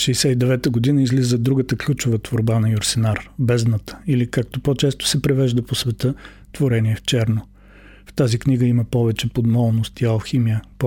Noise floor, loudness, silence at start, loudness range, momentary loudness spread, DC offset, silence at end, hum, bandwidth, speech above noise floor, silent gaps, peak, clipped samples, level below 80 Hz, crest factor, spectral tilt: -45 dBFS; -19 LUFS; 0 s; 2 LU; 5 LU; under 0.1%; 0 s; none; 16.5 kHz; 26 dB; none; -6 dBFS; under 0.1%; -44 dBFS; 14 dB; -6 dB/octave